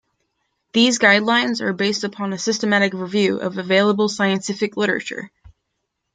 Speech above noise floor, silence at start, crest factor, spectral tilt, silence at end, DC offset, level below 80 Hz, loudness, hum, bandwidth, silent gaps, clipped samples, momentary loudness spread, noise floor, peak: 57 dB; 0.75 s; 18 dB; -4 dB/octave; 0.65 s; under 0.1%; -62 dBFS; -18 LUFS; none; 9.6 kHz; none; under 0.1%; 11 LU; -76 dBFS; -2 dBFS